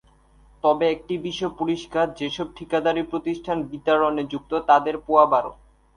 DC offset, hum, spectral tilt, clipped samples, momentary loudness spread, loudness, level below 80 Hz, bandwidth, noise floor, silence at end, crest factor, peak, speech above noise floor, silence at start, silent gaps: under 0.1%; none; -5.5 dB/octave; under 0.1%; 10 LU; -23 LUFS; -54 dBFS; 10.5 kHz; -54 dBFS; 0.45 s; 20 dB; -2 dBFS; 32 dB; 0.65 s; none